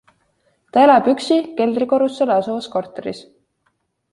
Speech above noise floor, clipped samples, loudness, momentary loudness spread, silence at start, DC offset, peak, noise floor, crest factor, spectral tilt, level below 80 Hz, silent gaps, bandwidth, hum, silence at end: 51 dB; under 0.1%; -17 LUFS; 17 LU; 0.75 s; under 0.1%; -2 dBFS; -68 dBFS; 16 dB; -5.5 dB/octave; -64 dBFS; none; 11.5 kHz; none; 0.9 s